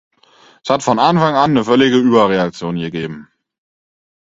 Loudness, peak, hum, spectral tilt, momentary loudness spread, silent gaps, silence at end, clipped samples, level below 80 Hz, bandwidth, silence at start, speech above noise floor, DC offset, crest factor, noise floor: -14 LUFS; 0 dBFS; none; -6 dB/octave; 14 LU; none; 1.1 s; under 0.1%; -54 dBFS; 7.8 kHz; 0.65 s; 35 dB; under 0.1%; 16 dB; -49 dBFS